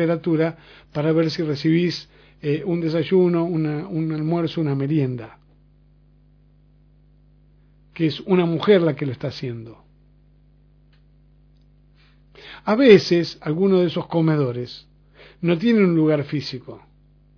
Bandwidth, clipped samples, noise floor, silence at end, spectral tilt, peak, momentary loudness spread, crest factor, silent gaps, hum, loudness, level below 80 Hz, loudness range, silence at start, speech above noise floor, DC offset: 5.4 kHz; under 0.1%; -54 dBFS; 0.6 s; -8 dB/octave; 0 dBFS; 15 LU; 22 dB; none; 50 Hz at -50 dBFS; -20 LUFS; -56 dBFS; 11 LU; 0 s; 34 dB; under 0.1%